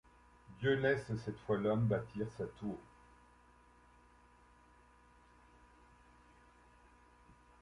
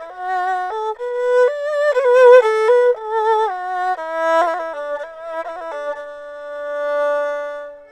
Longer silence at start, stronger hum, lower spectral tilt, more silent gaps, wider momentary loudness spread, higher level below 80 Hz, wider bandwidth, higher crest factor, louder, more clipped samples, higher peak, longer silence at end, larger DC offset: first, 0.5 s vs 0 s; first, 60 Hz at -65 dBFS vs none; first, -7.5 dB/octave vs -1.5 dB/octave; neither; second, 12 LU vs 17 LU; about the same, -66 dBFS vs -64 dBFS; first, 11 kHz vs 9.6 kHz; about the same, 22 dB vs 18 dB; second, -37 LUFS vs -17 LUFS; neither; second, -20 dBFS vs 0 dBFS; first, 4.8 s vs 0.05 s; neither